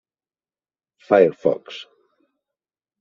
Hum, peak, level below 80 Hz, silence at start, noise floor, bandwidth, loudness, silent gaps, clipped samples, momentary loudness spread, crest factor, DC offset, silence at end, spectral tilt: none; -2 dBFS; -68 dBFS; 1.1 s; under -90 dBFS; 7.2 kHz; -19 LUFS; none; under 0.1%; 21 LU; 22 dB; under 0.1%; 1.2 s; -4.5 dB/octave